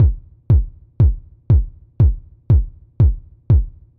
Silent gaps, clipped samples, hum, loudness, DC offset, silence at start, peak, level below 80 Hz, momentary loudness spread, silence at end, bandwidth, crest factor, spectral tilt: none; under 0.1%; none; -18 LUFS; under 0.1%; 0 s; -6 dBFS; -20 dBFS; 15 LU; 0.3 s; 2.4 kHz; 10 dB; -13 dB/octave